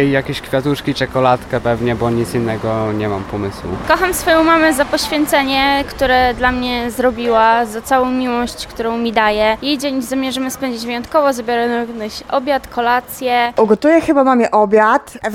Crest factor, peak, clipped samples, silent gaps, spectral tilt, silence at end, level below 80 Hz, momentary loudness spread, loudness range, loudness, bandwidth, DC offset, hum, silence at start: 14 dB; 0 dBFS; under 0.1%; none; -4.5 dB/octave; 0 s; -38 dBFS; 9 LU; 4 LU; -15 LUFS; 17 kHz; under 0.1%; none; 0 s